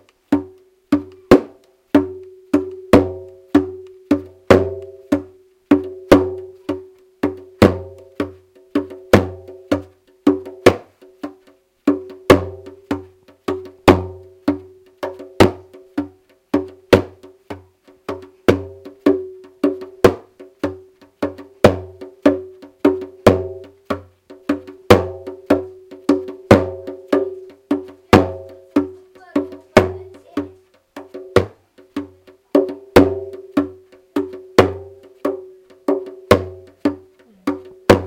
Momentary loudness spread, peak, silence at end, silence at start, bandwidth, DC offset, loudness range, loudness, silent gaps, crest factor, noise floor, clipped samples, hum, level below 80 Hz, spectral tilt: 20 LU; 0 dBFS; 0 s; 0.3 s; 17 kHz; under 0.1%; 3 LU; -19 LUFS; none; 18 dB; -54 dBFS; 0.2%; none; -44 dBFS; -6.5 dB/octave